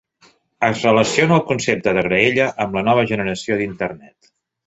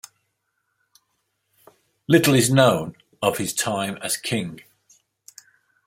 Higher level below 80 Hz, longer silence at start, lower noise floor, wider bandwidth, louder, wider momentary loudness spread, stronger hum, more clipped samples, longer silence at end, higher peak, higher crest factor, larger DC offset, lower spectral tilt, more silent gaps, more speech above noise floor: first, -52 dBFS vs -60 dBFS; second, 0.6 s vs 2.1 s; second, -55 dBFS vs -74 dBFS; second, 8.2 kHz vs 16.5 kHz; first, -17 LUFS vs -20 LUFS; second, 7 LU vs 14 LU; neither; neither; second, 0.6 s vs 1.25 s; about the same, 0 dBFS vs -2 dBFS; about the same, 18 dB vs 22 dB; neither; about the same, -5 dB/octave vs -4.5 dB/octave; neither; second, 38 dB vs 54 dB